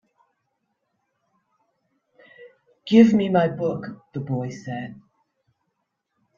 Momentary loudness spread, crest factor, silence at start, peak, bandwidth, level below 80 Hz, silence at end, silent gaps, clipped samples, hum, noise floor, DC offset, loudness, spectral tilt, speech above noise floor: 19 LU; 24 dB; 2.4 s; -2 dBFS; 7.2 kHz; -64 dBFS; 1.45 s; none; under 0.1%; none; -77 dBFS; under 0.1%; -21 LUFS; -7.5 dB/octave; 56 dB